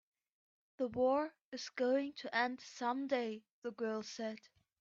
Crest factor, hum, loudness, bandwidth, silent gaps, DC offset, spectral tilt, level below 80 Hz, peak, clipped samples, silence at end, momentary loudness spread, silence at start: 18 dB; none; -39 LUFS; 7.6 kHz; 1.44-1.52 s, 3.51-3.62 s; under 0.1%; -4 dB/octave; -80 dBFS; -22 dBFS; under 0.1%; 0.4 s; 12 LU; 0.8 s